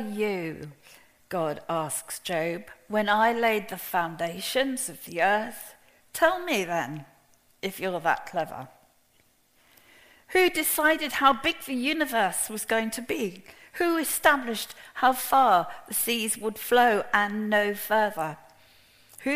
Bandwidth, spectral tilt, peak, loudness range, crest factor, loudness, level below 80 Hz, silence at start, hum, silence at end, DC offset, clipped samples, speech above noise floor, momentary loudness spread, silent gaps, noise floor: 15.5 kHz; -3 dB/octave; -6 dBFS; 6 LU; 22 dB; -26 LUFS; -62 dBFS; 0 s; none; 0 s; under 0.1%; under 0.1%; 38 dB; 14 LU; none; -64 dBFS